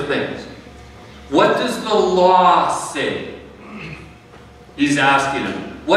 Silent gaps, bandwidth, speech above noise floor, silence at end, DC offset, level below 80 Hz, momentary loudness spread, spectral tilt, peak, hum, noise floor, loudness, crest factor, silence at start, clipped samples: none; 14 kHz; 26 dB; 0 s; under 0.1%; -48 dBFS; 22 LU; -4.5 dB/octave; -2 dBFS; none; -42 dBFS; -17 LUFS; 18 dB; 0 s; under 0.1%